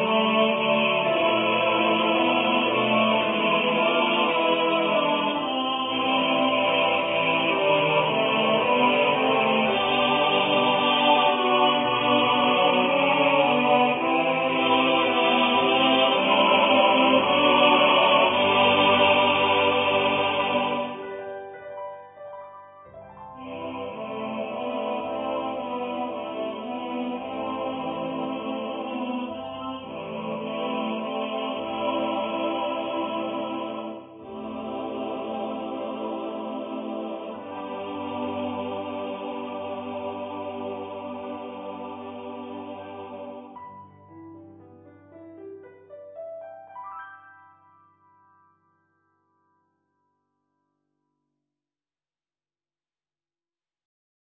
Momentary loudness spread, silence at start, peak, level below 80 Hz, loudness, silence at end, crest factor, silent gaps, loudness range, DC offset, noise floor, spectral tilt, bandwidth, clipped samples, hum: 18 LU; 0 s; -6 dBFS; -64 dBFS; -23 LUFS; 7.15 s; 18 dB; none; 20 LU; under 0.1%; under -90 dBFS; -8.5 dB/octave; 4 kHz; under 0.1%; none